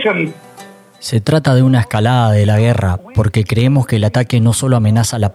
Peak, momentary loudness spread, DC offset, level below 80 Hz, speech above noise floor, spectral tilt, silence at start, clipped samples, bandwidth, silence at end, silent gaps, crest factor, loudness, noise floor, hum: 0 dBFS; 6 LU; under 0.1%; -42 dBFS; 26 dB; -6 dB/octave; 0 s; under 0.1%; 14 kHz; 0.05 s; none; 12 dB; -13 LUFS; -38 dBFS; none